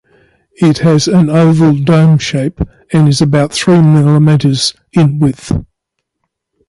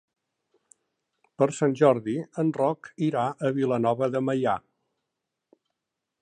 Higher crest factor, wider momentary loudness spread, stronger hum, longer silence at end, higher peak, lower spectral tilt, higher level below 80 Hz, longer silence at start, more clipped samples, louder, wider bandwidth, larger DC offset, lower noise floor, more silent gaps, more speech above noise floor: second, 10 dB vs 20 dB; about the same, 8 LU vs 7 LU; neither; second, 1.05 s vs 1.6 s; first, 0 dBFS vs -6 dBFS; about the same, -6.5 dB/octave vs -7 dB/octave; first, -34 dBFS vs -72 dBFS; second, 0.6 s vs 1.4 s; neither; first, -10 LUFS vs -26 LUFS; first, 11.5 kHz vs 10 kHz; neither; second, -72 dBFS vs -85 dBFS; neither; about the same, 63 dB vs 60 dB